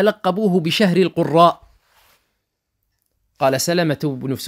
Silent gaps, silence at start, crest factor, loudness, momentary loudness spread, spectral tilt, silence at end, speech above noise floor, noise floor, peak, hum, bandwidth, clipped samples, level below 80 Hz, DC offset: none; 0 s; 18 dB; -17 LUFS; 8 LU; -5.5 dB/octave; 0 s; 57 dB; -74 dBFS; 0 dBFS; none; 16 kHz; under 0.1%; -60 dBFS; under 0.1%